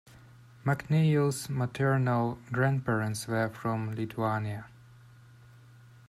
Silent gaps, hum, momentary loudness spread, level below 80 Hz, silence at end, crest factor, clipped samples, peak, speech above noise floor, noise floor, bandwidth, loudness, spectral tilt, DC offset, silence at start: none; none; 8 LU; -64 dBFS; 1.4 s; 18 dB; under 0.1%; -14 dBFS; 25 dB; -54 dBFS; 14 kHz; -30 LUFS; -6.5 dB/octave; under 0.1%; 0.65 s